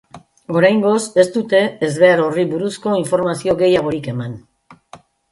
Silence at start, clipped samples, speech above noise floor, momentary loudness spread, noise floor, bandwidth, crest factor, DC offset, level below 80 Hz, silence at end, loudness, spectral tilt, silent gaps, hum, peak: 0.15 s; under 0.1%; 29 dB; 10 LU; -44 dBFS; 11.5 kHz; 16 dB; under 0.1%; -56 dBFS; 0.35 s; -16 LUFS; -5.5 dB/octave; none; none; 0 dBFS